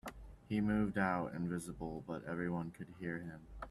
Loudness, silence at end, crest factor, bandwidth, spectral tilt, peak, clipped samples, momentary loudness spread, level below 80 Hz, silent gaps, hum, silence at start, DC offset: -40 LUFS; 0 s; 18 dB; 13 kHz; -7 dB/octave; -22 dBFS; under 0.1%; 15 LU; -58 dBFS; none; none; 0.05 s; under 0.1%